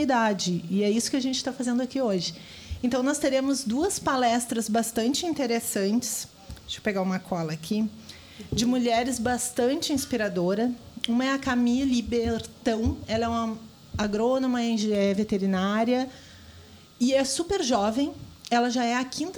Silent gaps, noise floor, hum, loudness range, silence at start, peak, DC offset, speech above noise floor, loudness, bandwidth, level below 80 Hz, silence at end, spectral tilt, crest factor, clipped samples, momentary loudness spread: none; -49 dBFS; none; 2 LU; 0 s; -8 dBFS; under 0.1%; 23 dB; -26 LUFS; 19 kHz; -50 dBFS; 0 s; -4 dB/octave; 18 dB; under 0.1%; 8 LU